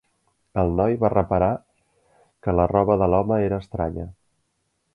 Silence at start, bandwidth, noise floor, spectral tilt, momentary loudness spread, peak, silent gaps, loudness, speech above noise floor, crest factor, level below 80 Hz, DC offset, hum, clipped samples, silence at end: 0.55 s; 4.9 kHz; -72 dBFS; -11 dB/octave; 12 LU; -4 dBFS; none; -22 LUFS; 52 dB; 20 dB; -40 dBFS; under 0.1%; none; under 0.1%; 0.85 s